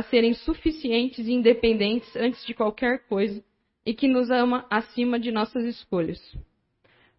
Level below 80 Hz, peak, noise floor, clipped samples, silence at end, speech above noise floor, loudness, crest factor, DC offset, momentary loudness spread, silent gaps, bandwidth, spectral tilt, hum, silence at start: -48 dBFS; -6 dBFS; -65 dBFS; under 0.1%; 0.75 s; 41 dB; -25 LUFS; 18 dB; under 0.1%; 9 LU; none; 5.8 kHz; -9.5 dB/octave; none; 0 s